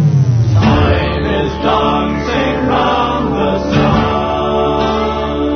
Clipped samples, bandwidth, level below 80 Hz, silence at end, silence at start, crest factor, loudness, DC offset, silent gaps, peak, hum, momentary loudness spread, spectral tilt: under 0.1%; 6.6 kHz; -28 dBFS; 0 s; 0 s; 12 dB; -13 LUFS; under 0.1%; none; 0 dBFS; none; 4 LU; -7.5 dB/octave